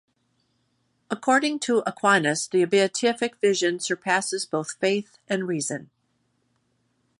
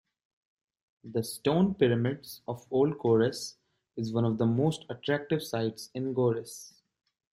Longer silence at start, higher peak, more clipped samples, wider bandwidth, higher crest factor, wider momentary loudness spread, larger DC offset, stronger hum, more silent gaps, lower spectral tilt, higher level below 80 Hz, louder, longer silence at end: about the same, 1.1 s vs 1.05 s; first, -6 dBFS vs -10 dBFS; neither; second, 11.5 kHz vs 16 kHz; about the same, 20 dB vs 20 dB; second, 8 LU vs 14 LU; neither; neither; neither; second, -3.5 dB/octave vs -6.5 dB/octave; second, -76 dBFS vs -66 dBFS; first, -24 LUFS vs -30 LUFS; first, 1.35 s vs 0.65 s